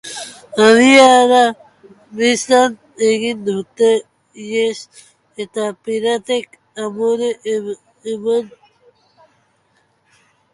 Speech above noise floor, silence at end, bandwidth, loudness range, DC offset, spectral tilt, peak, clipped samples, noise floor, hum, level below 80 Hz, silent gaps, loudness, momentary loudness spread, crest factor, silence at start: 46 dB; 2.05 s; 11.5 kHz; 10 LU; under 0.1%; -3 dB/octave; 0 dBFS; under 0.1%; -60 dBFS; none; -64 dBFS; none; -15 LUFS; 21 LU; 16 dB; 0.05 s